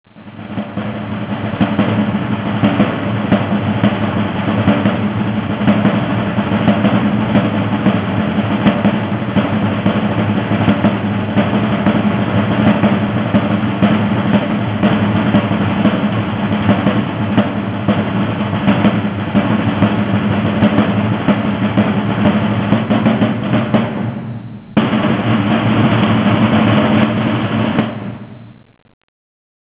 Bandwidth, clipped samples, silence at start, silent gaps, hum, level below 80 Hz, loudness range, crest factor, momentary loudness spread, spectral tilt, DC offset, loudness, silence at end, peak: 4 kHz; under 0.1%; 0.15 s; none; none; -38 dBFS; 2 LU; 14 dB; 5 LU; -11.5 dB/octave; under 0.1%; -15 LUFS; 1.2 s; 0 dBFS